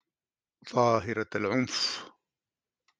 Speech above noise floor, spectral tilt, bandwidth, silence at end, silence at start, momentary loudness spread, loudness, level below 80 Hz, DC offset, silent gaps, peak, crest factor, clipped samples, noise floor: over 62 dB; -4.5 dB/octave; 10 kHz; 0.9 s; 0.65 s; 7 LU; -29 LUFS; -70 dBFS; under 0.1%; none; -10 dBFS; 22 dB; under 0.1%; under -90 dBFS